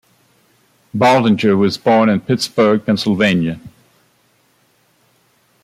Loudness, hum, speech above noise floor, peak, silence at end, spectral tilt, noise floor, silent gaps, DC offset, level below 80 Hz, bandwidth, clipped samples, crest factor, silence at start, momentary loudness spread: -14 LUFS; none; 44 dB; -2 dBFS; 1.95 s; -6 dB/octave; -58 dBFS; none; under 0.1%; -56 dBFS; 14.5 kHz; under 0.1%; 16 dB; 0.95 s; 7 LU